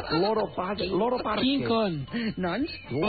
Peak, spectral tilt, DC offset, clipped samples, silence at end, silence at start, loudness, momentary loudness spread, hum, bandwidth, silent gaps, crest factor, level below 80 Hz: -14 dBFS; -4 dB/octave; 0.1%; under 0.1%; 0 s; 0 s; -27 LUFS; 6 LU; none; 4.9 kHz; none; 12 dB; -52 dBFS